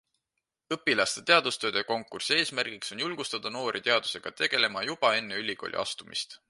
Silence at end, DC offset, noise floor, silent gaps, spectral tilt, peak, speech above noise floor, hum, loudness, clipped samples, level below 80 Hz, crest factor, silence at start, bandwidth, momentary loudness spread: 0.15 s; under 0.1%; -85 dBFS; none; -2 dB/octave; -6 dBFS; 55 dB; none; -28 LUFS; under 0.1%; -72 dBFS; 24 dB; 0.7 s; 11.5 kHz; 10 LU